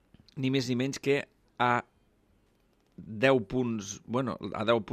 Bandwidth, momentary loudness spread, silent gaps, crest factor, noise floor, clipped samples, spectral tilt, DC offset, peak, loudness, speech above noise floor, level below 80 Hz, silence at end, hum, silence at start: 14.5 kHz; 14 LU; none; 20 dB; -68 dBFS; under 0.1%; -5.5 dB/octave; under 0.1%; -10 dBFS; -30 LUFS; 39 dB; -62 dBFS; 0 s; none; 0.35 s